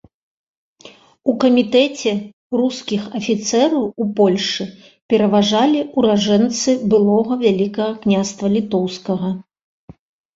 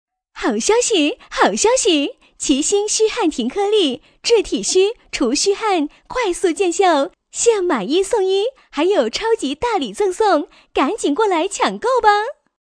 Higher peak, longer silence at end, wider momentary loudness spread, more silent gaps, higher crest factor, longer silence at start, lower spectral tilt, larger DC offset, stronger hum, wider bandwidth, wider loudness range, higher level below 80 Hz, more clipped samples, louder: about the same, -2 dBFS vs 0 dBFS; first, 0.95 s vs 0.45 s; first, 9 LU vs 6 LU; first, 2.33-2.50 s, 5.02-5.09 s vs none; about the same, 16 dB vs 16 dB; first, 0.85 s vs 0.35 s; first, -5 dB/octave vs -2 dB/octave; neither; neither; second, 7.8 kHz vs 11 kHz; about the same, 3 LU vs 2 LU; second, -58 dBFS vs -48 dBFS; neither; about the same, -17 LUFS vs -17 LUFS